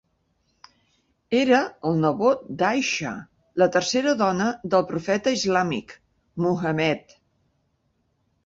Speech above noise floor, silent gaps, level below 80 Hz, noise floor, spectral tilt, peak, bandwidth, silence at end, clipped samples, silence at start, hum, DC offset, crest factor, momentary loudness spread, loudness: 48 dB; none; -62 dBFS; -70 dBFS; -5 dB/octave; -6 dBFS; 8 kHz; 1.45 s; under 0.1%; 1.3 s; none; under 0.1%; 18 dB; 9 LU; -23 LUFS